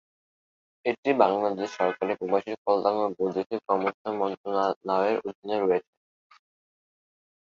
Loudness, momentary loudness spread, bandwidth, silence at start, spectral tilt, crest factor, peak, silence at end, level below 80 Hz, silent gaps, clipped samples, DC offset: -27 LUFS; 7 LU; 7.4 kHz; 0.85 s; -6 dB/octave; 22 dB; -6 dBFS; 1.6 s; -72 dBFS; 0.98-1.03 s, 2.58-2.65 s, 3.46-3.50 s, 3.94-4.05 s, 4.37-4.44 s, 4.76-4.81 s, 5.35-5.42 s; under 0.1%; under 0.1%